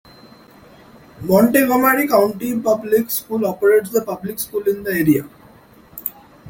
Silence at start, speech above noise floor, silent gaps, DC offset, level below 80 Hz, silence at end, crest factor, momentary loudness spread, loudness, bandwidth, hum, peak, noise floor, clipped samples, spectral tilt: 1.2 s; 30 dB; none; under 0.1%; -54 dBFS; 0 s; 18 dB; 14 LU; -17 LUFS; 17 kHz; none; 0 dBFS; -46 dBFS; under 0.1%; -5.5 dB/octave